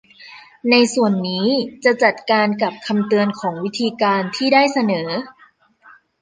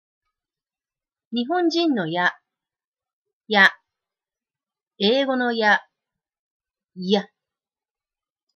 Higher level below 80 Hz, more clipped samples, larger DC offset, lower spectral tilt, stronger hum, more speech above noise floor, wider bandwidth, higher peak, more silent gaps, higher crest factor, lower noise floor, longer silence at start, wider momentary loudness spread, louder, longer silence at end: first, -66 dBFS vs -80 dBFS; neither; neither; about the same, -5 dB/octave vs -5 dB/octave; neither; second, 35 dB vs over 70 dB; about the same, 9.8 kHz vs 10.5 kHz; about the same, -2 dBFS vs -4 dBFS; second, none vs 2.87-2.92 s, 3.13-3.22 s, 3.33-3.40 s, 6.39-6.60 s; about the same, 18 dB vs 22 dB; second, -53 dBFS vs under -90 dBFS; second, 0.2 s vs 1.3 s; about the same, 9 LU vs 8 LU; about the same, -18 LUFS vs -20 LUFS; second, 0.9 s vs 1.3 s